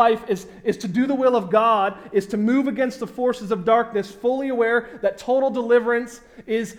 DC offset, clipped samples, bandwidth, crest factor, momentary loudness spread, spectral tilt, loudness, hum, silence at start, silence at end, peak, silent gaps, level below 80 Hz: under 0.1%; under 0.1%; 14.5 kHz; 16 dB; 8 LU; -6 dB/octave; -21 LUFS; none; 0 s; 0 s; -4 dBFS; none; -58 dBFS